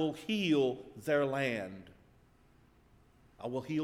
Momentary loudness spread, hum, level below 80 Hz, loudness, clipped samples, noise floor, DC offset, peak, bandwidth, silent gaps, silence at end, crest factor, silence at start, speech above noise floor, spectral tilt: 15 LU; none; -68 dBFS; -34 LUFS; under 0.1%; -64 dBFS; under 0.1%; -18 dBFS; 15 kHz; none; 0 s; 16 dB; 0 s; 31 dB; -6 dB/octave